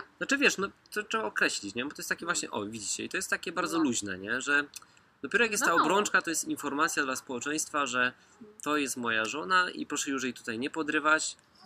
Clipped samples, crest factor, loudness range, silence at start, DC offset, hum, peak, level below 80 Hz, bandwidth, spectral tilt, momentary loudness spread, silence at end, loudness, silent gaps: under 0.1%; 20 dB; 3 LU; 0 s; under 0.1%; none; -10 dBFS; -72 dBFS; 15.5 kHz; -2 dB/octave; 9 LU; 0.3 s; -29 LUFS; none